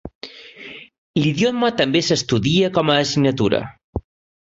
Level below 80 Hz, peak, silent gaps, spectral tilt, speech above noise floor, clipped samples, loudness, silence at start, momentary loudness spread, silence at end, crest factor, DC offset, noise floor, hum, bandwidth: -44 dBFS; -2 dBFS; 0.15-0.21 s, 0.98-1.14 s, 3.84-3.93 s; -5 dB/octave; 21 dB; under 0.1%; -18 LUFS; 0.05 s; 19 LU; 0.4 s; 18 dB; under 0.1%; -39 dBFS; none; 8 kHz